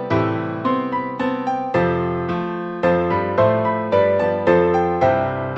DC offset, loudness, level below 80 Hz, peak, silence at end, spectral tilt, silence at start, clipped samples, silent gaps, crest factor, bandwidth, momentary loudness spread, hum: under 0.1%; -19 LUFS; -48 dBFS; -4 dBFS; 0 s; -8.5 dB/octave; 0 s; under 0.1%; none; 16 dB; 7.6 kHz; 6 LU; none